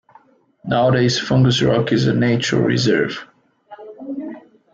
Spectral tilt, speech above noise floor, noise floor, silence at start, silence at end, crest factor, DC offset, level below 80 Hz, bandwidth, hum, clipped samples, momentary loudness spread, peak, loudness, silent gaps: -6 dB/octave; 36 dB; -52 dBFS; 0.65 s; 0.35 s; 14 dB; under 0.1%; -50 dBFS; 7.8 kHz; none; under 0.1%; 18 LU; -4 dBFS; -17 LUFS; none